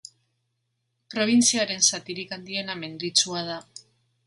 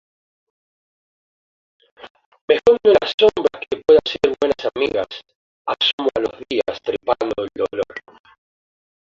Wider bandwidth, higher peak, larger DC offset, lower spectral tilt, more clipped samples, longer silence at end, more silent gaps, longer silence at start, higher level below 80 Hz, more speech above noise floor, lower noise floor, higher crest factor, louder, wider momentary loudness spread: first, 11.5 kHz vs 7.4 kHz; second, -6 dBFS vs -2 dBFS; neither; second, -1.5 dB/octave vs -4.5 dB/octave; neither; second, 0.45 s vs 1.1 s; second, none vs 2.10-2.15 s, 2.26-2.32 s, 2.41-2.48 s, 3.14-3.18 s, 5.35-5.65 s, 5.93-5.98 s; second, 1.1 s vs 2.05 s; second, -72 dBFS vs -54 dBFS; second, 52 dB vs over 71 dB; second, -77 dBFS vs under -90 dBFS; about the same, 22 dB vs 18 dB; second, -23 LUFS vs -18 LUFS; about the same, 14 LU vs 13 LU